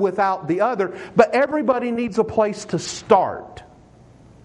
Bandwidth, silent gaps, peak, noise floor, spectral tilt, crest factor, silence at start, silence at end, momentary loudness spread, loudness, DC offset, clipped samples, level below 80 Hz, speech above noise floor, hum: 11 kHz; none; -2 dBFS; -48 dBFS; -5.5 dB/octave; 20 dB; 0 s; 0.8 s; 9 LU; -20 LUFS; under 0.1%; under 0.1%; -56 dBFS; 28 dB; none